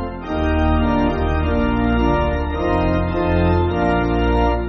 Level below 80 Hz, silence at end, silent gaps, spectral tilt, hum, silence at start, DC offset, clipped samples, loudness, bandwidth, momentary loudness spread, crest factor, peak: -24 dBFS; 0 s; none; -6.5 dB/octave; none; 0 s; under 0.1%; under 0.1%; -18 LUFS; 6 kHz; 3 LU; 14 dB; -4 dBFS